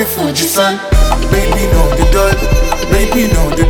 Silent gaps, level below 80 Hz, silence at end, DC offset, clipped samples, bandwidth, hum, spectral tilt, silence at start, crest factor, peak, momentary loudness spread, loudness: none; -14 dBFS; 0 s; under 0.1%; under 0.1%; 19 kHz; none; -4.5 dB/octave; 0 s; 10 dB; 0 dBFS; 2 LU; -12 LUFS